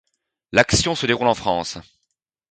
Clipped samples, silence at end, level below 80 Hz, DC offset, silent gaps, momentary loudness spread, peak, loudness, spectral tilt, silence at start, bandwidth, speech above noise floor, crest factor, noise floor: under 0.1%; 0.7 s; -42 dBFS; under 0.1%; none; 12 LU; 0 dBFS; -19 LUFS; -3.5 dB/octave; 0.55 s; 9.4 kHz; 57 dB; 22 dB; -76 dBFS